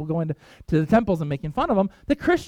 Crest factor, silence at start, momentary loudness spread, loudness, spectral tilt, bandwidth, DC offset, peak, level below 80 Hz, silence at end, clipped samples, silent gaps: 18 dB; 0 s; 7 LU; -23 LUFS; -8 dB/octave; 13 kHz; under 0.1%; -4 dBFS; -44 dBFS; 0 s; under 0.1%; none